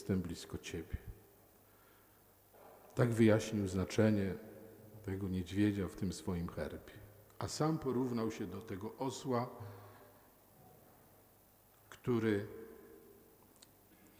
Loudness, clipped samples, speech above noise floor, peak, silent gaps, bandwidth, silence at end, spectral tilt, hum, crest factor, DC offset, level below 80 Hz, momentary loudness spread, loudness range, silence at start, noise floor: -38 LUFS; under 0.1%; 30 dB; -16 dBFS; none; 19 kHz; 1.1 s; -6.5 dB/octave; none; 24 dB; under 0.1%; -62 dBFS; 23 LU; 8 LU; 0 s; -66 dBFS